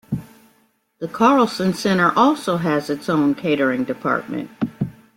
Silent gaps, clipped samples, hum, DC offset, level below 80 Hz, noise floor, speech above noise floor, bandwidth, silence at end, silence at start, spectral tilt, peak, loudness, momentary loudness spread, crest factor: none; under 0.1%; none; under 0.1%; -58 dBFS; -61 dBFS; 43 dB; 16.5 kHz; 0.25 s; 0.1 s; -6 dB/octave; -2 dBFS; -19 LUFS; 14 LU; 18 dB